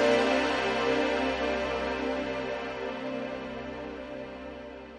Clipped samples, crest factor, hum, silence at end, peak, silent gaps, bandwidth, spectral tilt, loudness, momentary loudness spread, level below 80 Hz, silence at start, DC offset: under 0.1%; 18 dB; none; 0 s; -12 dBFS; none; 11 kHz; -4.5 dB/octave; -30 LUFS; 14 LU; -52 dBFS; 0 s; under 0.1%